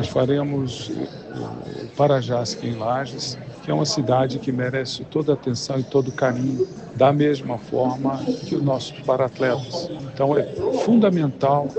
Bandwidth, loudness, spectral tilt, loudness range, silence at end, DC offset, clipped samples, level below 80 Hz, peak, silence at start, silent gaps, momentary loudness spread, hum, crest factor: 8.6 kHz; -22 LUFS; -6 dB/octave; 2 LU; 0 s; under 0.1%; under 0.1%; -56 dBFS; -2 dBFS; 0 s; none; 11 LU; none; 20 dB